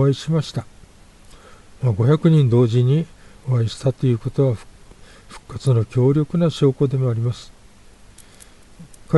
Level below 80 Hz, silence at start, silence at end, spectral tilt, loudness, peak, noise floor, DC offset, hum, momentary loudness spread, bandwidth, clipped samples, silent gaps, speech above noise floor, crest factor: -48 dBFS; 0 s; 0 s; -8 dB/octave; -19 LUFS; -2 dBFS; -46 dBFS; under 0.1%; 50 Hz at -50 dBFS; 14 LU; 11.5 kHz; under 0.1%; none; 28 dB; 18 dB